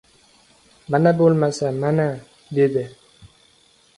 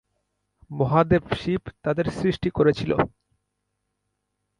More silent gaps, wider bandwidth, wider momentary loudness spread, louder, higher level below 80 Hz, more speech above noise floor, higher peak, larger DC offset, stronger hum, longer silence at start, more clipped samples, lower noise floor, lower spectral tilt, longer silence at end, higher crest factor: neither; about the same, 11.5 kHz vs 11 kHz; first, 12 LU vs 8 LU; first, -20 LUFS vs -23 LUFS; second, -58 dBFS vs -46 dBFS; second, 38 dB vs 55 dB; about the same, -4 dBFS vs -4 dBFS; neither; second, none vs 50 Hz at -45 dBFS; first, 0.9 s vs 0.7 s; neither; second, -56 dBFS vs -78 dBFS; about the same, -7.5 dB/octave vs -8 dB/octave; second, 0.7 s vs 1.5 s; about the same, 18 dB vs 20 dB